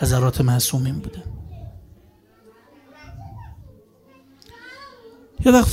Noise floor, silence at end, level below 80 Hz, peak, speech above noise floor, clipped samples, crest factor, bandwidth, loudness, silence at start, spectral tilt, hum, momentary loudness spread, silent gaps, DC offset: -53 dBFS; 0 s; -38 dBFS; -2 dBFS; 36 dB; under 0.1%; 20 dB; 16 kHz; -19 LUFS; 0 s; -5.5 dB/octave; none; 25 LU; none; under 0.1%